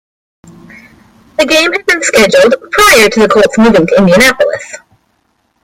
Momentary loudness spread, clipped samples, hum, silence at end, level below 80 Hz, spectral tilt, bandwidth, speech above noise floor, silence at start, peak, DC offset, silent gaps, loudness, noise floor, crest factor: 9 LU; 0.3%; none; 0.85 s; -38 dBFS; -3.5 dB/octave; over 20 kHz; 51 dB; 1.4 s; 0 dBFS; under 0.1%; none; -7 LUFS; -58 dBFS; 10 dB